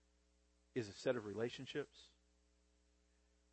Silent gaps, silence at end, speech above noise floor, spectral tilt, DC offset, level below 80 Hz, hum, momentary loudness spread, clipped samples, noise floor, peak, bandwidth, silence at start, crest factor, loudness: none; 1.45 s; 32 dB; -5.5 dB/octave; under 0.1%; -78 dBFS; none; 10 LU; under 0.1%; -77 dBFS; -26 dBFS; 8.4 kHz; 0.75 s; 22 dB; -45 LUFS